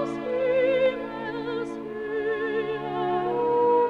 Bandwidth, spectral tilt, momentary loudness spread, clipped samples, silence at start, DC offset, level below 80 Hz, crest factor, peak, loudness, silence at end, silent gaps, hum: 7.2 kHz; -6.5 dB/octave; 10 LU; under 0.1%; 0 s; under 0.1%; -62 dBFS; 14 dB; -12 dBFS; -26 LUFS; 0 s; none; none